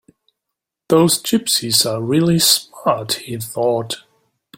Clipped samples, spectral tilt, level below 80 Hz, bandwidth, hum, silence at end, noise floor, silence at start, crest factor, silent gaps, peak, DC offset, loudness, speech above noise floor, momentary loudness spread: under 0.1%; -3.5 dB/octave; -56 dBFS; 16.5 kHz; none; 0.6 s; -81 dBFS; 0.9 s; 18 dB; none; 0 dBFS; under 0.1%; -16 LUFS; 65 dB; 10 LU